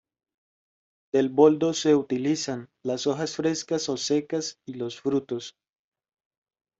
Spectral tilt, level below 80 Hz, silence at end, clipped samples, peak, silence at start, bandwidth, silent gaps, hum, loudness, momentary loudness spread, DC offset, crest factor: -4.5 dB/octave; -70 dBFS; 1.3 s; under 0.1%; -6 dBFS; 1.15 s; 8 kHz; none; none; -26 LUFS; 15 LU; under 0.1%; 22 dB